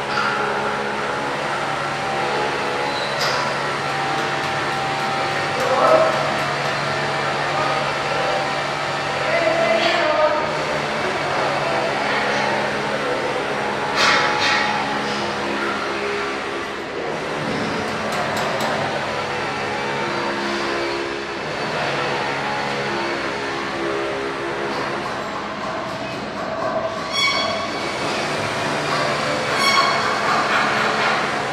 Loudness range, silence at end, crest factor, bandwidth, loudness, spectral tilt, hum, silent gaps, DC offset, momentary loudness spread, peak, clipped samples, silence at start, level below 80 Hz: 4 LU; 0 s; 20 dB; 16 kHz; -20 LUFS; -3.5 dB/octave; none; none; under 0.1%; 7 LU; -2 dBFS; under 0.1%; 0 s; -52 dBFS